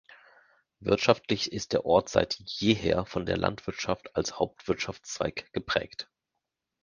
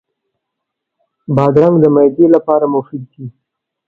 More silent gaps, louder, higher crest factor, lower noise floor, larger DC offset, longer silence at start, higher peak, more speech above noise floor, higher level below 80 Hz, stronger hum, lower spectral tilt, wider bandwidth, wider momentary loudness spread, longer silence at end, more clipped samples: neither; second, -29 LUFS vs -11 LUFS; first, 26 dB vs 14 dB; first, -85 dBFS vs -77 dBFS; neither; second, 0.1 s vs 1.3 s; second, -4 dBFS vs 0 dBFS; second, 56 dB vs 66 dB; about the same, -52 dBFS vs -52 dBFS; neither; second, -4.5 dB/octave vs -11 dB/octave; first, 10 kHz vs 5.2 kHz; second, 10 LU vs 21 LU; first, 0.8 s vs 0.6 s; neither